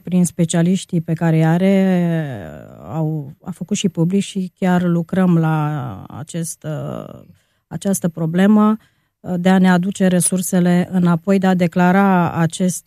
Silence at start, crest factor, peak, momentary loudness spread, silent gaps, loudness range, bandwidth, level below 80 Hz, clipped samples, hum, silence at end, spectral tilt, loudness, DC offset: 0.05 s; 16 dB; -2 dBFS; 15 LU; none; 5 LU; 15.5 kHz; -56 dBFS; under 0.1%; none; 0.05 s; -6.5 dB/octave; -17 LUFS; under 0.1%